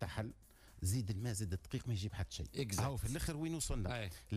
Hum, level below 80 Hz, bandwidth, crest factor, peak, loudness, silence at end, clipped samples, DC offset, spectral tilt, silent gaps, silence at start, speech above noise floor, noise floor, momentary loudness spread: none; -50 dBFS; 15.5 kHz; 12 dB; -28 dBFS; -41 LUFS; 0 s; under 0.1%; under 0.1%; -5 dB/octave; none; 0 s; 22 dB; -62 dBFS; 6 LU